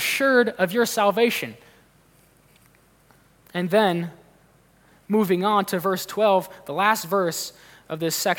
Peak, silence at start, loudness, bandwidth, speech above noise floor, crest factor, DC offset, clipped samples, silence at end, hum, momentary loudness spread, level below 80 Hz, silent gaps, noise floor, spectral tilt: -6 dBFS; 0 s; -22 LUFS; 18 kHz; 35 dB; 18 dB; under 0.1%; under 0.1%; 0 s; none; 12 LU; -68 dBFS; none; -57 dBFS; -4 dB/octave